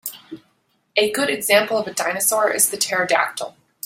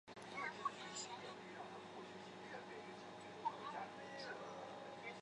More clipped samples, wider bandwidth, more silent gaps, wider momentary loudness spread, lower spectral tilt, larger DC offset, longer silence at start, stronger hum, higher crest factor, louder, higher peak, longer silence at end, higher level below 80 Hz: neither; first, 16.5 kHz vs 10.5 kHz; neither; first, 15 LU vs 8 LU; second, -1 dB/octave vs -3 dB/octave; neither; about the same, 0.05 s vs 0.05 s; neither; about the same, 20 dB vs 20 dB; first, -18 LUFS vs -50 LUFS; first, -2 dBFS vs -32 dBFS; first, 0.35 s vs 0 s; first, -68 dBFS vs -86 dBFS